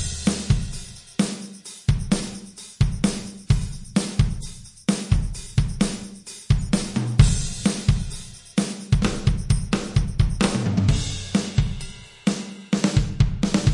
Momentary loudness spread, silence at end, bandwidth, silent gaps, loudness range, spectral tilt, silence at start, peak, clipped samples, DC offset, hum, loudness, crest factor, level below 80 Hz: 13 LU; 0 s; 11.5 kHz; none; 3 LU; -5.5 dB/octave; 0 s; -2 dBFS; under 0.1%; under 0.1%; none; -24 LUFS; 22 dB; -30 dBFS